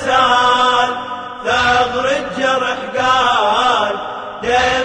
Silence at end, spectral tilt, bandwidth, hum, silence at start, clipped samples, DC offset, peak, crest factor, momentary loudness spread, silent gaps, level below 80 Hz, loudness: 0 s; -2.5 dB/octave; 10 kHz; none; 0 s; under 0.1%; under 0.1%; -2 dBFS; 14 dB; 11 LU; none; -44 dBFS; -14 LUFS